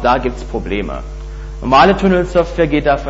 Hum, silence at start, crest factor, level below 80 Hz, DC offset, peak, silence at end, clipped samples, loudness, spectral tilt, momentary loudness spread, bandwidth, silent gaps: none; 0 s; 14 dB; -26 dBFS; under 0.1%; 0 dBFS; 0 s; under 0.1%; -14 LUFS; -6.5 dB/octave; 18 LU; 8 kHz; none